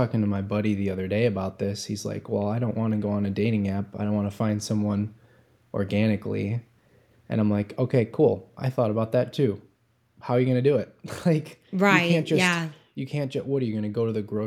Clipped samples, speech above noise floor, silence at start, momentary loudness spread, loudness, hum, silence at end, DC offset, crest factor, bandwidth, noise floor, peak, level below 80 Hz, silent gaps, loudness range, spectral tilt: under 0.1%; 41 dB; 0 s; 9 LU; -26 LUFS; none; 0 s; under 0.1%; 22 dB; 14 kHz; -66 dBFS; -4 dBFS; -66 dBFS; none; 4 LU; -6.5 dB/octave